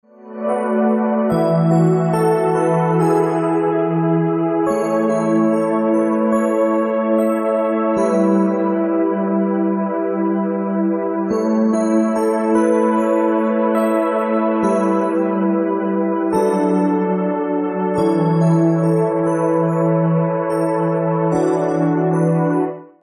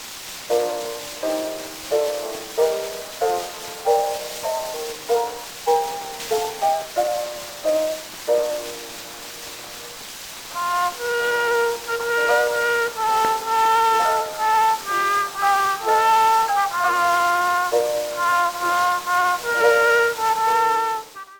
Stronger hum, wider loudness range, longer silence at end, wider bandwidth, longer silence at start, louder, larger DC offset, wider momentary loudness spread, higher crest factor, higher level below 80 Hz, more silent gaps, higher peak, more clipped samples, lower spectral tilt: neither; second, 2 LU vs 7 LU; first, 0.15 s vs 0 s; second, 13.5 kHz vs over 20 kHz; first, 0.2 s vs 0 s; first, -17 LUFS vs -21 LUFS; neither; second, 4 LU vs 13 LU; about the same, 12 dB vs 16 dB; about the same, -58 dBFS vs -58 dBFS; neither; about the same, -4 dBFS vs -4 dBFS; neither; first, -8.5 dB/octave vs -1 dB/octave